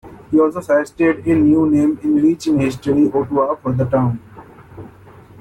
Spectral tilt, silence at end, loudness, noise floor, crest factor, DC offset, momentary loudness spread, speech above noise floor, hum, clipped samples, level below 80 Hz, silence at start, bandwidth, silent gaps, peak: -8 dB/octave; 0.55 s; -16 LUFS; -42 dBFS; 12 dB; under 0.1%; 5 LU; 27 dB; none; under 0.1%; -48 dBFS; 0.05 s; 11.5 kHz; none; -4 dBFS